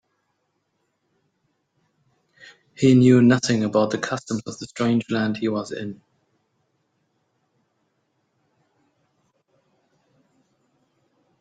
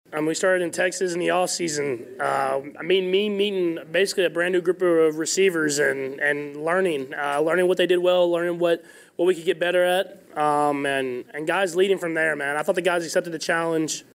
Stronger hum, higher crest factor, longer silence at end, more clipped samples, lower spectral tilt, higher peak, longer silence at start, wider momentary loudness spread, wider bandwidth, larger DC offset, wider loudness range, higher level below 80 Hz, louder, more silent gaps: neither; first, 20 dB vs 14 dB; first, 5.45 s vs 0.15 s; neither; first, -6 dB/octave vs -3.5 dB/octave; first, -4 dBFS vs -10 dBFS; first, 2.8 s vs 0.1 s; first, 17 LU vs 6 LU; second, 9.2 kHz vs 16 kHz; neither; first, 11 LU vs 2 LU; first, -64 dBFS vs -76 dBFS; first, -20 LUFS vs -23 LUFS; neither